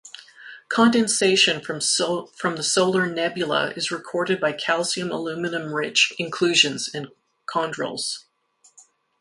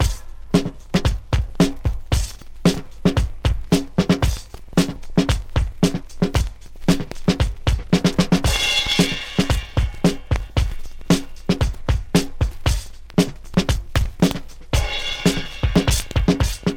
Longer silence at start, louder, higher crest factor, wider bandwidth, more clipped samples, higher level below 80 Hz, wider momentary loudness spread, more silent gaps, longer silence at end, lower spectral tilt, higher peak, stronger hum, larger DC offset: about the same, 0.05 s vs 0 s; about the same, -22 LUFS vs -21 LUFS; about the same, 20 dB vs 18 dB; second, 11.5 kHz vs 17 kHz; neither; second, -68 dBFS vs -26 dBFS; first, 12 LU vs 6 LU; neither; first, 1 s vs 0 s; second, -2.5 dB/octave vs -5 dB/octave; about the same, -4 dBFS vs -2 dBFS; neither; neither